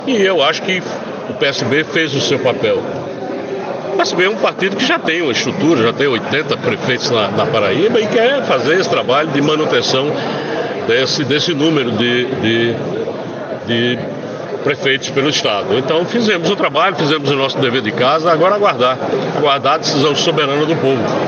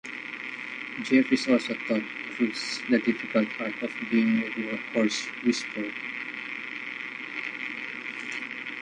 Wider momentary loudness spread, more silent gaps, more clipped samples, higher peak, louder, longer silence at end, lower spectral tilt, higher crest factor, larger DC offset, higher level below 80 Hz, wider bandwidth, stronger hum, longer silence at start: second, 7 LU vs 11 LU; neither; neither; first, -2 dBFS vs -10 dBFS; first, -15 LUFS vs -28 LUFS; about the same, 0 s vs 0 s; about the same, -4.5 dB/octave vs -4 dB/octave; second, 14 dB vs 20 dB; neither; first, -64 dBFS vs -74 dBFS; second, 7.8 kHz vs 10 kHz; neither; about the same, 0 s vs 0.05 s